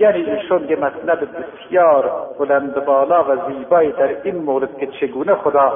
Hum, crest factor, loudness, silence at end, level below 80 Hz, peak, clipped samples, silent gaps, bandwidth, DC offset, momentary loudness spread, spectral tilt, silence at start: none; 14 dB; -17 LUFS; 0 s; -58 dBFS; -2 dBFS; under 0.1%; none; 3.7 kHz; under 0.1%; 9 LU; -11 dB/octave; 0 s